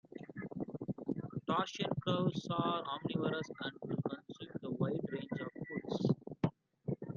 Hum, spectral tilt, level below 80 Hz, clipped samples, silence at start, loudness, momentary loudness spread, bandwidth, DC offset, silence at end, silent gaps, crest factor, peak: none; -7 dB/octave; -70 dBFS; under 0.1%; 0.15 s; -39 LUFS; 9 LU; 7.4 kHz; under 0.1%; 0 s; none; 20 dB; -18 dBFS